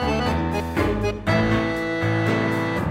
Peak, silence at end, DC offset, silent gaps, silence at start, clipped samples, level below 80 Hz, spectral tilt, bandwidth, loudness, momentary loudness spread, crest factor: -8 dBFS; 0 s; under 0.1%; none; 0 s; under 0.1%; -36 dBFS; -6.5 dB/octave; 16 kHz; -22 LUFS; 4 LU; 14 dB